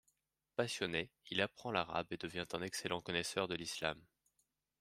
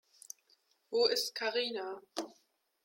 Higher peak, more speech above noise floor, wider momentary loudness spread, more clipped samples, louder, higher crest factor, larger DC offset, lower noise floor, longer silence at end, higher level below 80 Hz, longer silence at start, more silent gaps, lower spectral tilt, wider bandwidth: about the same, -18 dBFS vs -16 dBFS; first, 42 dB vs 38 dB; second, 5 LU vs 20 LU; neither; second, -40 LUFS vs -34 LUFS; about the same, 24 dB vs 22 dB; neither; first, -83 dBFS vs -72 dBFS; first, 0.8 s vs 0.5 s; first, -72 dBFS vs -86 dBFS; second, 0.6 s vs 0.9 s; neither; first, -3.5 dB/octave vs -0.5 dB/octave; about the same, 15.5 kHz vs 16.5 kHz